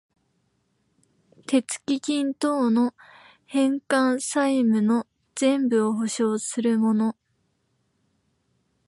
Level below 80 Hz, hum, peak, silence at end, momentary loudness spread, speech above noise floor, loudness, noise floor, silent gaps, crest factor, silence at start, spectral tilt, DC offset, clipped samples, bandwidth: -76 dBFS; none; -10 dBFS; 1.75 s; 6 LU; 49 dB; -23 LUFS; -71 dBFS; none; 16 dB; 1.5 s; -4.5 dB/octave; under 0.1%; under 0.1%; 11.5 kHz